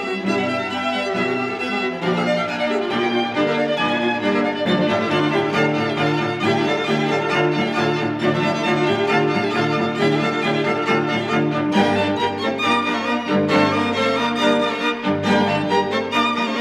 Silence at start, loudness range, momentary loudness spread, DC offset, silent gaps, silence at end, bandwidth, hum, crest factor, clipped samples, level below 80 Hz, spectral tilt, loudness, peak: 0 s; 2 LU; 3 LU; under 0.1%; none; 0 s; 13 kHz; none; 14 dB; under 0.1%; -62 dBFS; -5.5 dB/octave; -19 LUFS; -4 dBFS